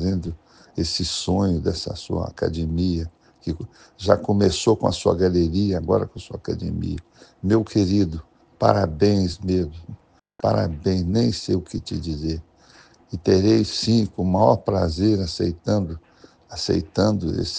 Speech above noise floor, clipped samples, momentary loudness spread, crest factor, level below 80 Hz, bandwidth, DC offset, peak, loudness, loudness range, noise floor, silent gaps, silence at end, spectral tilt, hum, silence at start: 30 dB; under 0.1%; 13 LU; 22 dB; -44 dBFS; 9.6 kHz; under 0.1%; 0 dBFS; -22 LUFS; 4 LU; -52 dBFS; none; 0 s; -6.5 dB/octave; none; 0 s